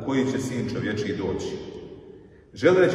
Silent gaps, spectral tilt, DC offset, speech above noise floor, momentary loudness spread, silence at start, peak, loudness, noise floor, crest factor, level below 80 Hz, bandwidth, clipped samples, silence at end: none; -6 dB/octave; under 0.1%; 24 dB; 21 LU; 0 s; -6 dBFS; -26 LUFS; -47 dBFS; 18 dB; -54 dBFS; 12 kHz; under 0.1%; 0 s